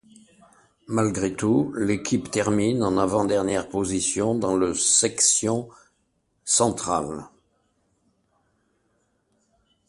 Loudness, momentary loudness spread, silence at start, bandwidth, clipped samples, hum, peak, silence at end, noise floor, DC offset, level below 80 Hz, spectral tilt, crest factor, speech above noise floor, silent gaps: -22 LUFS; 9 LU; 0.9 s; 11.5 kHz; under 0.1%; none; -6 dBFS; 2.6 s; -70 dBFS; under 0.1%; -54 dBFS; -3.5 dB/octave; 20 dB; 48 dB; none